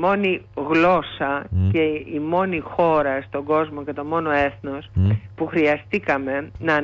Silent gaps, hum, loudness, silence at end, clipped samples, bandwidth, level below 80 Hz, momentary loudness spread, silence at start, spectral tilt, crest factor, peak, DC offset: none; none; -21 LUFS; 0 s; under 0.1%; 7 kHz; -44 dBFS; 8 LU; 0 s; -8.5 dB/octave; 14 dB; -6 dBFS; under 0.1%